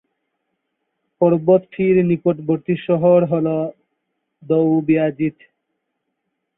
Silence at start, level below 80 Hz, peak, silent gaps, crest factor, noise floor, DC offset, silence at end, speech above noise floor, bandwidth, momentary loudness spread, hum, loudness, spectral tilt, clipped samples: 1.2 s; -60 dBFS; -2 dBFS; none; 16 dB; -75 dBFS; under 0.1%; 1.25 s; 59 dB; 3.8 kHz; 8 LU; none; -17 LUFS; -13 dB/octave; under 0.1%